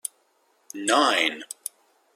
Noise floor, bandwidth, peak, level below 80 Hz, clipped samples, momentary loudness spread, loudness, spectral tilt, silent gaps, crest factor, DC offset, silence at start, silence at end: -66 dBFS; 16.5 kHz; -6 dBFS; -78 dBFS; under 0.1%; 17 LU; -22 LUFS; -0.5 dB/octave; none; 20 dB; under 0.1%; 0.05 s; 0.7 s